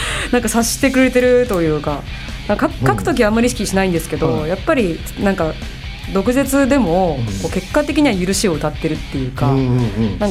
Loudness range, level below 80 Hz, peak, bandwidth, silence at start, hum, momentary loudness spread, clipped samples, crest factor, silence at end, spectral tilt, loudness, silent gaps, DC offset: 2 LU; -30 dBFS; -2 dBFS; 16 kHz; 0 s; none; 8 LU; under 0.1%; 14 dB; 0 s; -5 dB/octave; -16 LUFS; none; under 0.1%